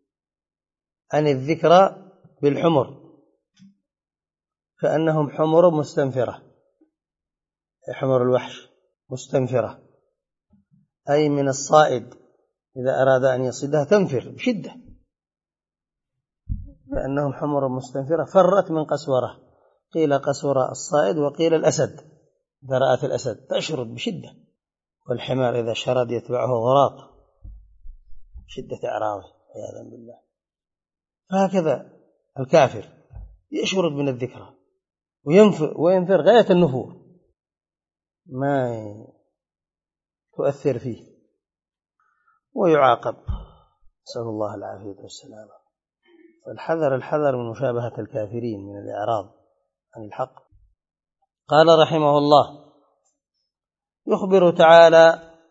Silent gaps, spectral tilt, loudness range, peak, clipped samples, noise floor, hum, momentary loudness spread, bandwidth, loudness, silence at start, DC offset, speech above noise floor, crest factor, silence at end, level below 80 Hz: none; -6 dB/octave; 11 LU; 0 dBFS; under 0.1%; under -90 dBFS; none; 20 LU; 8 kHz; -20 LUFS; 1.1 s; under 0.1%; over 70 dB; 22 dB; 0.3 s; -50 dBFS